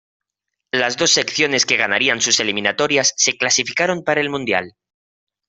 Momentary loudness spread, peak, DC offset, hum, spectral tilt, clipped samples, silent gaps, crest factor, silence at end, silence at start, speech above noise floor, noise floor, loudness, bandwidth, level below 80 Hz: 6 LU; -2 dBFS; under 0.1%; none; -1 dB/octave; under 0.1%; none; 18 dB; 0.8 s; 0.75 s; 62 dB; -80 dBFS; -16 LUFS; 8.4 kHz; -60 dBFS